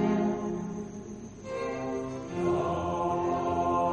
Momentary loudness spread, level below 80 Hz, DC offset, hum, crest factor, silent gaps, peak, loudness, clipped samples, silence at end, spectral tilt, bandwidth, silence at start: 12 LU; -54 dBFS; under 0.1%; none; 14 dB; none; -16 dBFS; -31 LUFS; under 0.1%; 0 s; -7 dB/octave; 9.2 kHz; 0 s